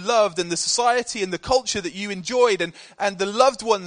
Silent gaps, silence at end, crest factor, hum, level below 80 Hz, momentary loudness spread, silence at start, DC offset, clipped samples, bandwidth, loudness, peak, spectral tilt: none; 0 s; 20 dB; none; -52 dBFS; 8 LU; 0 s; under 0.1%; under 0.1%; 10 kHz; -21 LUFS; -2 dBFS; -2.5 dB/octave